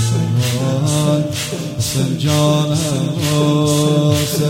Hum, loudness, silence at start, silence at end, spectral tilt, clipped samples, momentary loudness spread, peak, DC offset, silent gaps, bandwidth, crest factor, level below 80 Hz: none; -16 LUFS; 0 s; 0 s; -5.5 dB/octave; under 0.1%; 5 LU; -2 dBFS; under 0.1%; none; 16.5 kHz; 14 dB; -44 dBFS